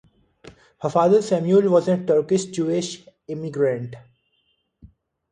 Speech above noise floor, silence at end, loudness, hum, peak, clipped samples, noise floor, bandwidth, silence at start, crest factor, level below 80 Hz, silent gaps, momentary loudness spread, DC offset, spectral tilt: 49 dB; 1.3 s; -21 LUFS; none; -6 dBFS; under 0.1%; -69 dBFS; 10 kHz; 0.45 s; 16 dB; -62 dBFS; none; 15 LU; under 0.1%; -6.5 dB/octave